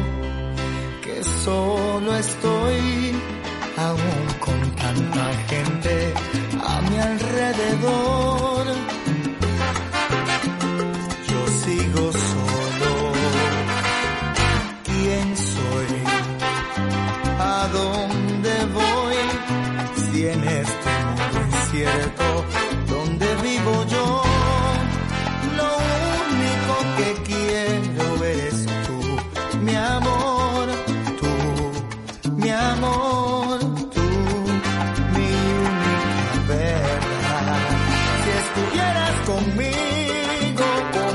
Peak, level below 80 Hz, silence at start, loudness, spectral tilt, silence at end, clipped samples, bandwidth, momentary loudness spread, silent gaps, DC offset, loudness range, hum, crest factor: -6 dBFS; -34 dBFS; 0 s; -22 LUFS; -5 dB/octave; 0 s; under 0.1%; 11.5 kHz; 5 LU; none; under 0.1%; 2 LU; none; 16 dB